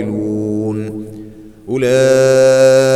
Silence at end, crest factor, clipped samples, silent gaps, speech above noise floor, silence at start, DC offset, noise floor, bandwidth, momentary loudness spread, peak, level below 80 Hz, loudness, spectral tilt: 0 s; 12 dB; under 0.1%; none; 24 dB; 0 s; under 0.1%; -34 dBFS; 14 kHz; 19 LU; -2 dBFS; -48 dBFS; -12 LUFS; -5.5 dB/octave